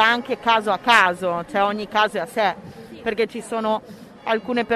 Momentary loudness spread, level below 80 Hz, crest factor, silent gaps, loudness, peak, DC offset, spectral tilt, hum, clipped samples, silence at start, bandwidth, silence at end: 12 LU; -58 dBFS; 20 dB; none; -21 LUFS; 0 dBFS; under 0.1%; -3.5 dB/octave; none; under 0.1%; 0 s; 14 kHz; 0 s